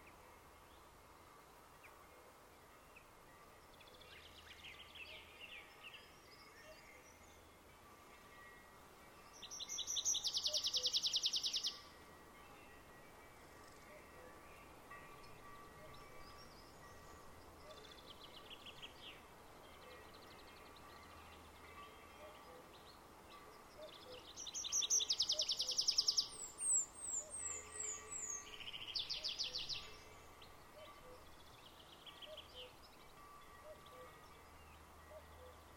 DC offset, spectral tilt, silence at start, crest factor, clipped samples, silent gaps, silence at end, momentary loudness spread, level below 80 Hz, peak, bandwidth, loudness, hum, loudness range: under 0.1%; 0.5 dB/octave; 0 s; 26 dB; under 0.1%; none; 0 s; 25 LU; -72 dBFS; -22 dBFS; 16 kHz; -40 LUFS; none; 21 LU